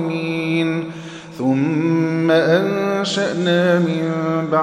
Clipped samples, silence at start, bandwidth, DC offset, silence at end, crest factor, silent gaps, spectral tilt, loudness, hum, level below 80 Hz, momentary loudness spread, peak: under 0.1%; 0 s; 12 kHz; under 0.1%; 0 s; 14 dB; none; -6.5 dB/octave; -18 LUFS; none; -62 dBFS; 8 LU; -4 dBFS